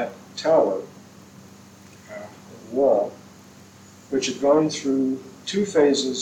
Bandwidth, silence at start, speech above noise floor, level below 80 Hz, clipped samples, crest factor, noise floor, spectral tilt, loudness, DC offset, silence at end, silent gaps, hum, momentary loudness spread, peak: 16 kHz; 0 s; 27 dB; -66 dBFS; under 0.1%; 18 dB; -47 dBFS; -4.5 dB/octave; -22 LUFS; under 0.1%; 0 s; none; none; 20 LU; -6 dBFS